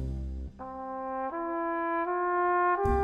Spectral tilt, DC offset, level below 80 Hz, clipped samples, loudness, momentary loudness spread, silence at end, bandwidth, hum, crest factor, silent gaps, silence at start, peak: -9 dB/octave; under 0.1%; -40 dBFS; under 0.1%; -30 LUFS; 14 LU; 0 s; 7.8 kHz; none; 16 dB; none; 0 s; -14 dBFS